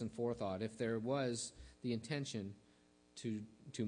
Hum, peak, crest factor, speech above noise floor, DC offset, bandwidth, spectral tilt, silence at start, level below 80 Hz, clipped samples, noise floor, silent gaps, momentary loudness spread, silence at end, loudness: 60 Hz at -65 dBFS; -26 dBFS; 16 dB; 28 dB; under 0.1%; 10.5 kHz; -5.5 dB/octave; 0 s; -70 dBFS; under 0.1%; -70 dBFS; none; 12 LU; 0 s; -43 LUFS